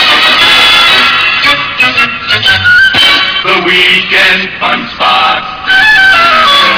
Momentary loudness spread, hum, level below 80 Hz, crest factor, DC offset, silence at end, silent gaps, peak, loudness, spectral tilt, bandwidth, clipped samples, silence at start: 7 LU; none; -38 dBFS; 6 dB; under 0.1%; 0 s; none; 0 dBFS; -4 LUFS; -2.5 dB/octave; 5.4 kHz; 6%; 0 s